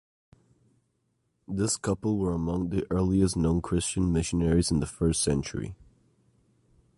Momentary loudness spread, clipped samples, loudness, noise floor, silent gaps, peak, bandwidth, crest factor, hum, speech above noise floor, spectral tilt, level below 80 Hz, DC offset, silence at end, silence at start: 6 LU; under 0.1%; -27 LUFS; -75 dBFS; none; -12 dBFS; 11.5 kHz; 18 dB; none; 48 dB; -5.5 dB/octave; -42 dBFS; under 0.1%; 1.15 s; 1.5 s